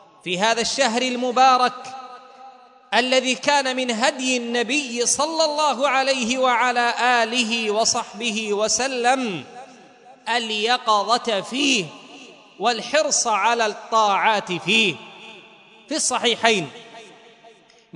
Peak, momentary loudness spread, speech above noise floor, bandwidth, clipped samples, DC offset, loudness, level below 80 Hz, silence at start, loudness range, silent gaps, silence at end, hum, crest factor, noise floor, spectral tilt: 0 dBFS; 11 LU; 30 dB; 11 kHz; under 0.1%; under 0.1%; -20 LUFS; -68 dBFS; 0.25 s; 3 LU; none; 0.45 s; none; 22 dB; -50 dBFS; -1.5 dB/octave